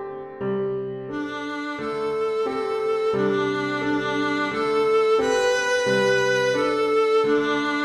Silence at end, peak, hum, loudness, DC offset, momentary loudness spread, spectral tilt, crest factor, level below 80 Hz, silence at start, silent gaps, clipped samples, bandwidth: 0 s; -10 dBFS; none; -22 LUFS; under 0.1%; 10 LU; -4.5 dB/octave; 12 dB; -60 dBFS; 0 s; none; under 0.1%; 12.5 kHz